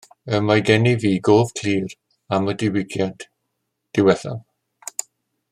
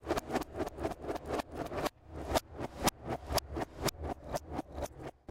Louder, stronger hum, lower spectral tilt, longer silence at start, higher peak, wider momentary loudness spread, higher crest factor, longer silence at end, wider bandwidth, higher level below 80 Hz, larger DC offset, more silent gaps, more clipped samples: first, -20 LUFS vs -38 LUFS; neither; about the same, -5.5 dB/octave vs -4.5 dB/octave; first, 0.25 s vs 0 s; first, -2 dBFS vs -14 dBFS; first, 15 LU vs 8 LU; second, 18 dB vs 24 dB; first, 1.1 s vs 0.2 s; about the same, 15.5 kHz vs 16.5 kHz; second, -58 dBFS vs -48 dBFS; neither; neither; neither